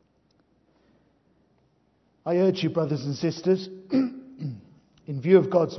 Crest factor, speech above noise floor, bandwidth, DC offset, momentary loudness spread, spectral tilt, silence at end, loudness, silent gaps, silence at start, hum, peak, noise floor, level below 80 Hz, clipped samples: 22 dB; 44 dB; 6.2 kHz; under 0.1%; 17 LU; -7.5 dB/octave; 0 s; -25 LUFS; none; 2.25 s; none; -6 dBFS; -66 dBFS; -72 dBFS; under 0.1%